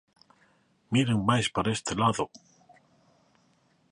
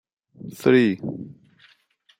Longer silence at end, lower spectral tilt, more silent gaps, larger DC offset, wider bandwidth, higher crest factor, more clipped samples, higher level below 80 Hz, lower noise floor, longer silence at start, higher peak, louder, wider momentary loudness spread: first, 1.55 s vs 0.85 s; second, -5 dB/octave vs -7 dB/octave; neither; neither; second, 11 kHz vs 16.5 kHz; about the same, 20 dB vs 20 dB; neither; first, -58 dBFS vs -68 dBFS; first, -67 dBFS vs -61 dBFS; first, 0.9 s vs 0.45 s; second, -12 dBFS vs -4 dBFS; second, -27 LUFS vs -21 LUFS; second, 6 LU vs 24 LU